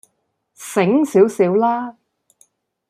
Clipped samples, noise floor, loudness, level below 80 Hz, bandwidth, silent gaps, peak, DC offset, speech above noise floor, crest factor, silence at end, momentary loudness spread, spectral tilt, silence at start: under 0.1%; -70 dBFS; -16 LUFS; -68 dBFS; 15 kHz; none; -2 dBFS; under 0.1%; 55 dB; 16 dB; 1 s; 14 LU; -6.5 dB/octave; 0.6 s